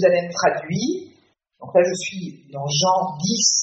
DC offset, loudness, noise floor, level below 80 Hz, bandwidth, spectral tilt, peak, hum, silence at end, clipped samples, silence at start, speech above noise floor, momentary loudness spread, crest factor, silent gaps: under 0.1%; -21 LUFS; -59 dBFS; -66 dBFS; 8 kHz; -3.5 dB/octave; -4 dBFS; none; 0 s; under 0.1%; 0 s; 39 dB; 13 LU; 18 dB; none